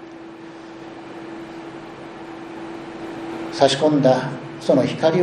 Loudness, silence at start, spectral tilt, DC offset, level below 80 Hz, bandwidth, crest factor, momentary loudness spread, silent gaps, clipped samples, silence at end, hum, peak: -19 LUFS; 0 s; -5.5 dB/octave; under 0.1%; -60 dBFS; 10.5 kHz; 22 dB; 21 LU; none; under 0.1%; 0 s; none; 0 dBFS